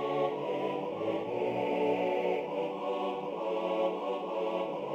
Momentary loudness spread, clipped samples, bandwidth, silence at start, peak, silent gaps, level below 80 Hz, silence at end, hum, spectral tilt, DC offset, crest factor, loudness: 4 LU; under 0.1%; 8.6 kHz; 0 s; -18 dBFS; none; -78 dBFS; 0 s; none; -7 dB/octave; under 0.1%; 14 dB; -33 LUFS